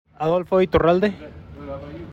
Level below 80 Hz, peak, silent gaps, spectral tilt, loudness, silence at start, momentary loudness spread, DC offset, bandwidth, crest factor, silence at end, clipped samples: -42 dBFS; -6 dBFS; none; -8 dB/octave; -19 LUFS; 0.2 s; 21 LU; under 0.1%; 7.4 kHz; 16 dB; 0 s; under 0.1%